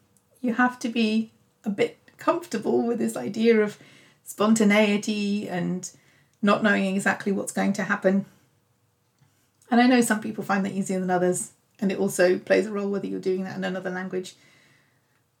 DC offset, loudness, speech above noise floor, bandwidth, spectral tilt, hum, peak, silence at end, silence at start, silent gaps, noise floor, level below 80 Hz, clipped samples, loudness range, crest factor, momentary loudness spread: under 0.1%; -24 LUFS; 44 dB; 16.5 kHz; -5 dB/octave; none; -6 dBFS; 1.1 s; 0.45 s; none; -68 dBFS; -78 dBFS; under 0.1%; 3 LU; 18 dB; 11 LU